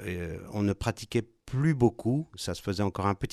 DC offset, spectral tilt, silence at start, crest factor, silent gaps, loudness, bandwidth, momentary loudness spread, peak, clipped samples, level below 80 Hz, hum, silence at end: under 0.1%; -6.5 dB/octave; 0 s; 18 dB; none; -30 LUFS; 14 kHz; 10 LU; -12 dBFS; under 0.1%; -50 dBFS; none; 0 s